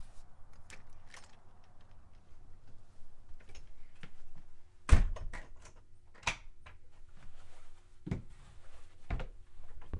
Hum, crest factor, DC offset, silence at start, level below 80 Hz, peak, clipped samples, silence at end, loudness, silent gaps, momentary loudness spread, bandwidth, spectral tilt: none; 28 dB; under 0.1%; 0 s; -42 dBFS; -10 dBFS; under 0.1%; 0 s; -38 LUFS; none; 24 LU; 11 kHz; -5 dB/octave